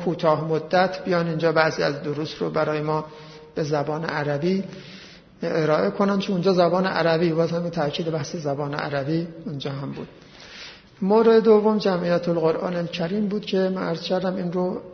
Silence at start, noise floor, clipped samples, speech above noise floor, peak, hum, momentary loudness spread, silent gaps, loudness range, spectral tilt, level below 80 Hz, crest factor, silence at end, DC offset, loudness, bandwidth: 0 s; -42 dBFS; under 0.1%; 20 dB; -4 dBFS; none; 14 LU; none; 6 LU; -7 dB/octave; -60 dBFS; 20 dB; 0 s; under 0.1%; -23 LUFS; 6.6 kHz